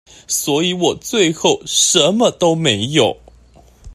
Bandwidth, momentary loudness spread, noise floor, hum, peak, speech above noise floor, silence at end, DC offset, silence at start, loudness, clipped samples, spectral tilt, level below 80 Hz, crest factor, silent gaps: 14.5 kHz; 7 LU; -46 dBFS; none; 0 dBFS; 31 dB; 0 s; under 0.1%; 0.3 s; -15 LUFS; under 0.1%; -3 dB/octave; -48 dBFS; 16 dB; none